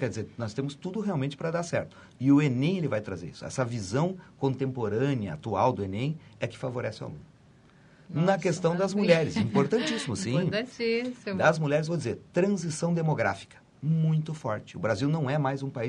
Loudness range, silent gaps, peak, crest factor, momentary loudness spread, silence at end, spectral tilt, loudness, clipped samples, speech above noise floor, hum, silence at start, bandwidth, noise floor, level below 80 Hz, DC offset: 4 LU; none; -8 dBFS; 20 dB; 11 LU; 0 s; -6.5 dB/octave; -28 LUFS; under 0.1%; 29 dB; none; 0 s; 10.5 kHz; -57 dBFS; -64 dBFS; under 0.1%